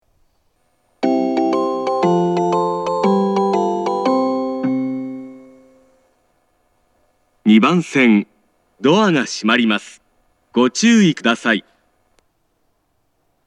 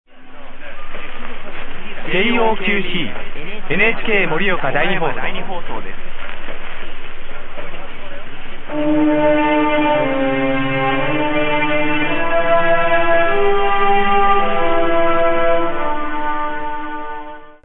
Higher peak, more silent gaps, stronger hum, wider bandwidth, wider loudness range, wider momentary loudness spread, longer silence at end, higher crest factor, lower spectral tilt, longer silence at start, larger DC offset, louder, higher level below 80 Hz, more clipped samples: about the same, 0 dBFS vs -2 dBFS; neither; neither; first, 10.5 kHz vs 3.9 kHz; second, 6 LU vs 9 LU; second, 9 LU vs 18 LU; first, 1.85 s vs 0.15 s; about the same, 18 dB vs 14 dB; second, -5 dB/octave vs -9 dB/octave; first, 1 s vs 0.1 s; neither; about the same, -16 LUFS vs -17 LUFS; second, -68 dBFS vs -26 dBFS; neither